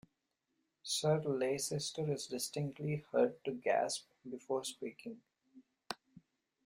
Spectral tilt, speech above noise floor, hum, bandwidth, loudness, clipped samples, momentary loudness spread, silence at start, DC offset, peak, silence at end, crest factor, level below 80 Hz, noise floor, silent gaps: -4.5 dB/octave; 48 dB; none; 16 kHz; -38 LUFS; under 0.1%; 16 LU; 0.85 s; under 0.1%; -20 dBFS; 0.45 s; 18 dB; -78 dBFS; -85 dBFS; none